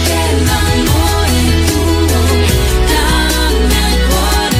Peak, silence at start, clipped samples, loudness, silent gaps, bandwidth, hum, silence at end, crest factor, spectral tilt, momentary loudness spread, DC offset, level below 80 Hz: 0 dBFS; 0 s; under 0.1%; -12 LUFS; none; 16 kHz; none; 0 s; 10 dB; -4.5 dB/octave; 1 LU; under 0.1%; -16 dBFS